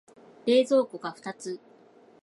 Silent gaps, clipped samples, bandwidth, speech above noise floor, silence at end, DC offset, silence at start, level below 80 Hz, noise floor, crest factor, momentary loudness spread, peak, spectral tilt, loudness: none; under 0.1%; 11.5 kHz; 30 dB; 0.65 s; under 0.1%; 0.45 s; -82 dBFS; -56 dBFS; 18 dB; 17 LU; -12 dBFS; -4.5 dB/octave; -27 LUFS